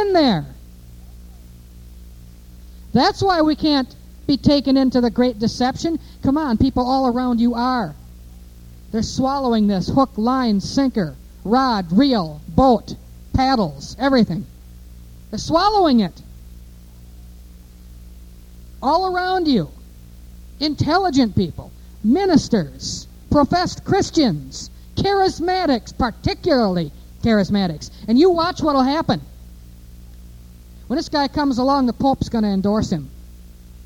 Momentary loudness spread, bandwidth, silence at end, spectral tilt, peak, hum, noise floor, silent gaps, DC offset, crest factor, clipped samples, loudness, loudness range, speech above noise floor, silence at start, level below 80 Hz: 11 LU; 16.5 kHz; 0 s; -6 dB/octave; 0 dBFS; 60 Hz at -40 dBFS; -41 dBFS; none; under 0.1%; 20 dB; under 0.1%; -19 LUFS; 4 LU; 23 dB; 0 s; -38 dBFS